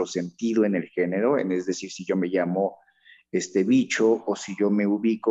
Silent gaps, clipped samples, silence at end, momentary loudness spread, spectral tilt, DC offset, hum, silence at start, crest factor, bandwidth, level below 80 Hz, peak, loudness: none; under 0.1%; 0 s; 8 LU; -5.5 dB/octave; under 0.1%; none; 0 s; 14 dB; 8.2 kHz; -72 dBFS; -10 dBFS; -24 LUFS